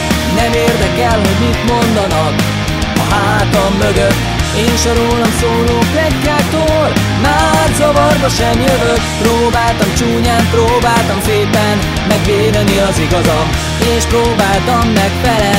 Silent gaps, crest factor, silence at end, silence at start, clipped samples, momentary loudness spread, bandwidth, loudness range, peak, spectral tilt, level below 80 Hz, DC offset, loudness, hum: none; 10 dB; 0 s; 0 s; under 0.1%; 3 LU; 16.5 kHz; 1 LU; 0 dBFS; -5 dB/octave; -22 dBFS; under 0.1%; -11 LUFS; none